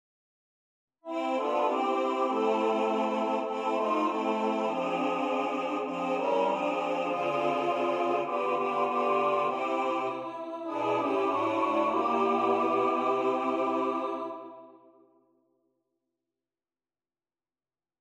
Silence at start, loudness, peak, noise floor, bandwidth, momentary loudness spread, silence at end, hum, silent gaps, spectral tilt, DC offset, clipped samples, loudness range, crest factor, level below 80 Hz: 1.05 s; -29 LUFS; -16 dBFS; under -90 dBFS; 11.5 kHz; 6 LU; 3.25 s; none; none; -5.5 dB/octave; under 0.1%; under 0.1%; 4 LU; 14 dB; -82 dBFS